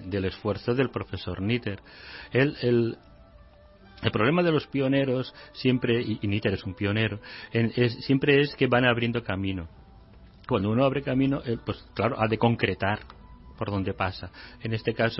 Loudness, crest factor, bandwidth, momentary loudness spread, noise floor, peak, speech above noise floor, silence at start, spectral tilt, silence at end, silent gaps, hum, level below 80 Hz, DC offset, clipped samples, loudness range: -26 LUFS; 20 dB; 5.8 kHz; 13 LU; -53 dBFS; -6 dBFS; 26 dB; 0 s; -10.5 dB/octave; 0 s; none; none; -52 dBFS; under 0.1%; under 0.1%; 3 LU